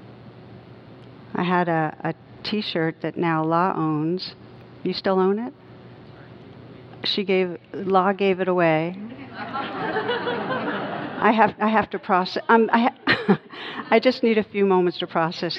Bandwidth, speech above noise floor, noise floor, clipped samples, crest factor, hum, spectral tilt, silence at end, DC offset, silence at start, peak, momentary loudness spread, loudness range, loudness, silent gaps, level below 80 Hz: 6.4 kHz; 23 dB; -44 dBFS; under 0.1%; 22 dB; none; -7.5 dB/octave; 0 s; under 0.1%; 0 s; -2 dBFS; 12 LU; 6 LU; -22 LUFS; none; -64 dBFS